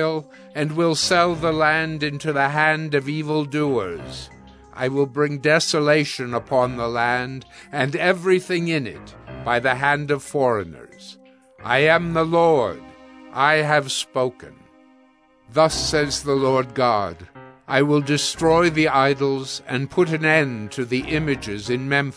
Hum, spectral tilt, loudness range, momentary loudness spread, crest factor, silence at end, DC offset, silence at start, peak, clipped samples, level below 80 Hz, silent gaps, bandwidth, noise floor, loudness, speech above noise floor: none; -4.5 dB/octave; 3 LU; 13 LU; 20 dB; 0.05 s; under 0.1%; 0 s; -2 dBFS; under 0.1%; -48 dBFS; none; 11 kHz; -56 dBFS; -20 LUFS; 35 dB